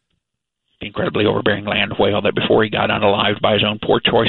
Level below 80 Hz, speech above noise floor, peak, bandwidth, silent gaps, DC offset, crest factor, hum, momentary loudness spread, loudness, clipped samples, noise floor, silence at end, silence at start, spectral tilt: -46 dBFS; 62 dB; 0 dBFS; 4.4 kHz; none; under 0.1%; 18 dB; none; 5 LU; -17 LUFS; under 0.1%; -79 dBFS; 0 s; 0.8 s; -9.5 dB/octave